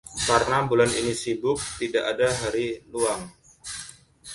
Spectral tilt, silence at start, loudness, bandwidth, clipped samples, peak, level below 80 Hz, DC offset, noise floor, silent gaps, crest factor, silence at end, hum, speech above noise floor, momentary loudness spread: -3.5 dB/octave; 0.05 s; -24 LUFS; 11.5 kHz; under 0.1%; -4 dBFS; -50 dBFS; under 0.1%; -45 dBFS; none; 22 dB; 0 s; none; 21 dB; 15 LU